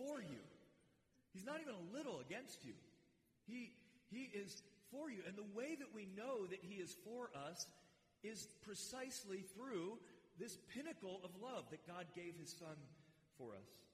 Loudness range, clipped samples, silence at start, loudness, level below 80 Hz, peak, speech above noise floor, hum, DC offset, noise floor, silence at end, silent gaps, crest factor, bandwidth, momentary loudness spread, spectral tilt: 3 LU; under 0.1%; 0 s; -53 LUFS; -88 dBFS; -36 dBFS; 26 dB; none; under 0.1%; -79 dBFS; 0 s; none; 18 dB; 15.5 kHz; 10 LU; -4 dB/octave